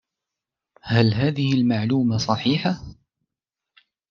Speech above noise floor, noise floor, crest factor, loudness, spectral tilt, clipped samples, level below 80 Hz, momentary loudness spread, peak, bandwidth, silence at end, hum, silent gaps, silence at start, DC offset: 67 dB; -87 dBFS; 20 dB; -21 LUFS; -6.5 dB/octave; under 0.1%; -54 dBFS; 6 LU; -4 dBFS; 7.2 kHz; 1.15 s; none; none; 0.85 s; under 0.1%